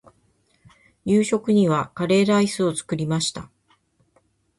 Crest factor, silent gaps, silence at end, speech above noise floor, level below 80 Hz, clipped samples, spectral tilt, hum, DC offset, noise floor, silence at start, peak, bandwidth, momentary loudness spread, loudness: 16 dB; none; 1.15 s; 44 dB; -58 dBFS; under 0.1%; -5.5 dB/octave; none; under 0.1%; -64 dBFS; 1.05 s; -8 dBFS; 11.5 kHz; 8 LU; -21 LUFS